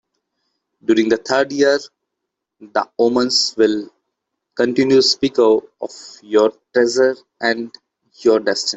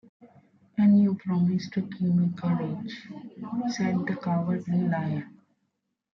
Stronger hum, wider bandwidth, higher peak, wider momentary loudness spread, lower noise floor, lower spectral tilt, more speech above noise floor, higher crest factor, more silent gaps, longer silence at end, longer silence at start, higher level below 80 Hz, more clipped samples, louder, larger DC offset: neither; first, 8.2 kHz vs 6.4 kHz; first, -2 dBFS vs -12 dBFS; about the same, 14 LU vs 15 LU; about the same, -79 dBFS vs -78 dBFS; second, -3.5 dB/octave vs -8 dB/octave; first, 63 dB vs 53 dB; about the same, 16 dB vs 14 dB; neither; second, 0 s vs 0.8 s; first, 0.9 s vs 0.25 s; first, -60 dBFS vs -70 dBFS; neither; first, -17 LUFS vs -27 LUFS; neither